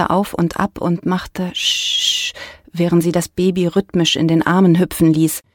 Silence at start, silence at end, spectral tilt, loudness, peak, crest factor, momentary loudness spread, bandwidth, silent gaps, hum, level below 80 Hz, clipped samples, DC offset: 0 s; 0.15 s; -5 dB/octave; -16 LUFS; 0 dBFS; 16 dB; 8 LU; 18 kHz; none; none; -44 dBFS; under 0.1%; under 0.1%